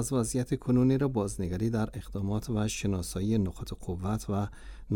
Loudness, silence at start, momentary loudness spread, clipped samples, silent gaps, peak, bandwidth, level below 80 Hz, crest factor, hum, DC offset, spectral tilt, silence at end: -31 LUFS; 0 s; 10 LU; under 0.1%; none; -14 dBFS; 17.5 kHz; -46 dBFS; 14 dB; none; under 0.1%; -6.5 dB/octave; 0 s